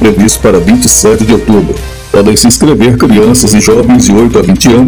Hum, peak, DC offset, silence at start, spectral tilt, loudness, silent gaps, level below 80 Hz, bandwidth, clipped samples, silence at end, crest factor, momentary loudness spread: none; 0 dBFS; 2%; 0 s; -4.5 dB/octave; -5 LUFS; none; -22 dBFS; over 20 kHz; 20%; 0 s; 4 dB; 4 LU